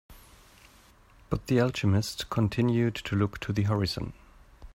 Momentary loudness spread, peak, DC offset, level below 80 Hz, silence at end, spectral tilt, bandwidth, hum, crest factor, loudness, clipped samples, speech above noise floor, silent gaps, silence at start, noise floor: 9 LU; -12 dBFS; under 0.1%; -50 dBFS; 0.05 s; -6.5 dB/octave; 16 kHz; none; 18 dB; -28 LUFS; under 0.1%; 30 dB; none; 0.1 s; -57 dBFS